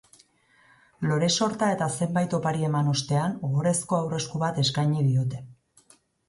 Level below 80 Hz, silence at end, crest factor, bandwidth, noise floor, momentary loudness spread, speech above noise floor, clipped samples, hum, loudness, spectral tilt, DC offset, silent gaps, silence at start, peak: -62 dBFS; 0.75 s; 16 dB; 11.5 kHz; -61 dBFS; 4 LU; 37 dB; under 0.1%; none; -25 LUFS; -5 dB/octave; under 0.1%; none; 1 s; -12 dBFS